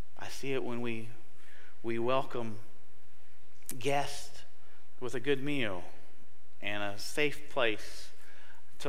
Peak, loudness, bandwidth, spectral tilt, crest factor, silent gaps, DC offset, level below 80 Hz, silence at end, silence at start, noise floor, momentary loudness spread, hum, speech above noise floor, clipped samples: -16 dBFS; -36 LUFS; 16 kHz; -4.5 dB/octave; 22 dB; none; 4%; -66 dBFS; 0 s; 0.15 s; -64 dBFS; 19 LU; none; 29 dB; under 0.1%